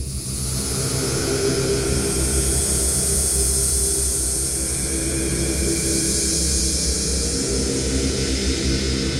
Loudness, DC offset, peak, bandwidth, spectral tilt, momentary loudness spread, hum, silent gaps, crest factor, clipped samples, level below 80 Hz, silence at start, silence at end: -20 LUFS; under 0.1%; -6 dBFS; 16 kHz; -3 dB/octave; 4 LU; none; none; 14 dB; under 0.1%; -28 dBFS; 0 s; 0 s